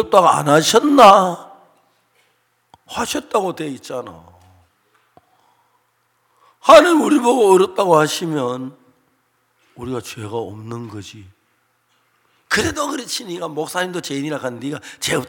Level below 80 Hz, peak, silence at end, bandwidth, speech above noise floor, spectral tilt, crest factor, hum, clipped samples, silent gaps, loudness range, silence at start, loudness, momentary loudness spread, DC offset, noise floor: -56 dBFS; 0 dBFS; 0 s; 17.5 kHz; 48 dB; -4 dB/octave; 18 dB; none; under 0.1%; none; 17 LU; 0 s; -16 LUFS; 22 LU; under 0.1%; -64 dBFS